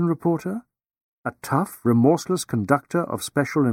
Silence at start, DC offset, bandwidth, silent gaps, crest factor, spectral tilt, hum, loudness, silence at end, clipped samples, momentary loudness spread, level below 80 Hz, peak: 0 s; under 0.1%; 17 kHz; 1.01-1.24 s; 20 dB; -6.5 dB/octave; none; -23 LUFS; 0 s; under 0.1%; 14 LU; -62 dBFS; -4 dBFS